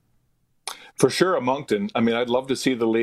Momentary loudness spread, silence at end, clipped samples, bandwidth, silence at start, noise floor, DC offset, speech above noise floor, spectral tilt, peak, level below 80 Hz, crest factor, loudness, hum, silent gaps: 15 LU; 0 s; under 0.1%; 14.5 kHz; 0.65 s; -66 dBFS; under 0.1%; 45 dB; -4.5 dB/octave; -4 dBFS; -62 dBFS; 20 dB; -22 LUFS; none; none